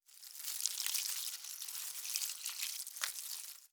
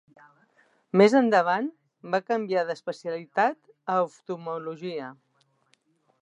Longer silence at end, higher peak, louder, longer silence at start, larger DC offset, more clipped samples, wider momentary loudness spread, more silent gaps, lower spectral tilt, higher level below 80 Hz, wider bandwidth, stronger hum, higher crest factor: second, 0.05 s vs 1.1 s; second, -10 dBFS vs -6 dBFS; second, -39 LUFS vs -26 LUFS; second, 0.1 s vs 0.95 s; neither; neither; second, 8 LU vs 16 LU; neither; second, 7.5 dB/octave vs -6 dB/octave; second, under -90 dBFS vs -82 dBFS; first, over 20 kHz vs 10.5 kHz; neither; first, 32 dB vs 22 dB